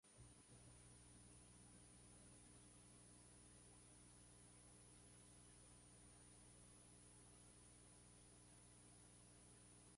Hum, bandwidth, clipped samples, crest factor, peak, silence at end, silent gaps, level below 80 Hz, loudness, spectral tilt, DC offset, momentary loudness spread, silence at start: 60 Hz at -70 dBFS; 11.5 kHz; under 0.1%; 14 dB; -54 dBFS; 0 s; none; -76 dBFS; -66 LUFS; -3.5 dB/octave; under 0.1%; 1 LU; 0.05 s